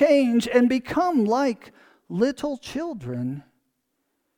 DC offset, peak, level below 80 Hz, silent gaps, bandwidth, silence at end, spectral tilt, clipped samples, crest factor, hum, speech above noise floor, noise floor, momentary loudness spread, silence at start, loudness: under 0.1%; -6 dBFS; -60 dBFS; none; 16 kHz; 0.95 s; -6 dB/octave; under 0.1%; 18 dB; none; 53 dB; -75 dBFS; 13 LU; 0 s; -23 LUFS